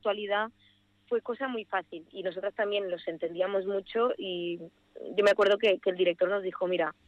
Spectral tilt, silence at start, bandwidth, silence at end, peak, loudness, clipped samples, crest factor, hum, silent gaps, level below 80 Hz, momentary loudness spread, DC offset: -5 dB/octave; 0.05 s; 11 kHz; 0.15 s; -14 dBFS; -30 LUFS; under 0.1%; 16 dB; 50 Hz at -65 dBFS; none; -74 dBFS; 13 LU; under 0.1%